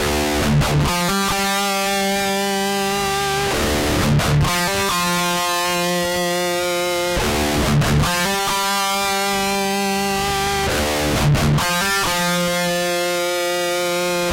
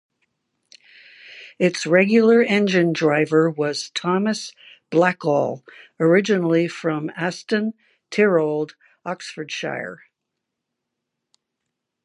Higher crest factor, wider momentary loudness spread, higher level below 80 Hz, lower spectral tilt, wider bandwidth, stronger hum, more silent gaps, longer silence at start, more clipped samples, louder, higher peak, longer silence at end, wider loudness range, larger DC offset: second, 12 dB vs 20 dB; second, 3 LU vs 15 LU; first, -32 dBFS vs -74 dBFS; second, -4 dB/octave vs -5.5 dB/octave; first, 16 kHz vs 11.5 kHz; neither; neither; second, 0 s vs 1.25 s; neither; about the same, -18 LUFS vs -20 LUFS; second, -8 dBFS vs -2 dBFS; second, 0 s vs 2.1 s; second, 1 LU vs 7 LU; neither